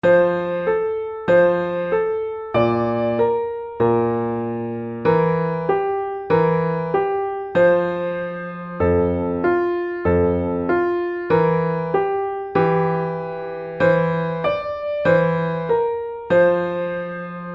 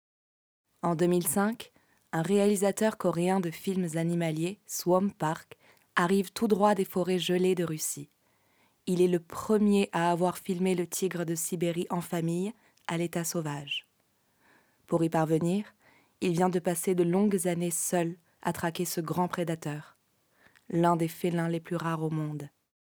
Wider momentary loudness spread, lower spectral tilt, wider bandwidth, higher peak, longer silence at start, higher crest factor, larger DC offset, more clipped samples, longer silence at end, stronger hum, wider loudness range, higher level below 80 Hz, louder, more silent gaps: about the same, 9 LU vs 9 LU; first, -9.5 dB/octave vs -5.5 dB/octave; second, 5.8 kHz vs over 20 kHz; first, -4 dBFS vs -12 dBFS; second, 0.05 s vs 0.85 s; about the same, 16 dB vs 18 dB; neither; neither; second, 0 s vs 0.45 s; neither; second, 1 LU vs 4 LU; first, -46 dBFS vs -72 dBFS; first, -20 LUFS vs -29 LUFS; neither